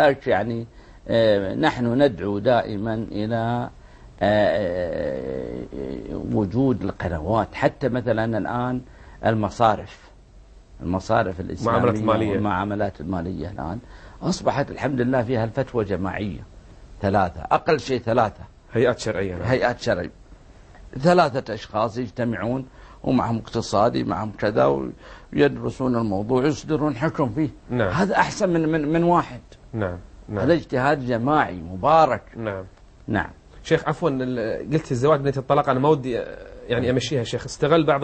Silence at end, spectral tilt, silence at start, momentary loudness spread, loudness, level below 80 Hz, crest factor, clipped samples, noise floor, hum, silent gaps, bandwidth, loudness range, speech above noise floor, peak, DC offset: 0 s; -6.5 dB/octave; 0 s; 11 LU; -23 LUFS; -46 dBFS; 20 dB; under 0.1%; -47 dBFS; none; none; 8.8 kHz; 3 LU; 26 dB; -4 dBFS; under 0.1%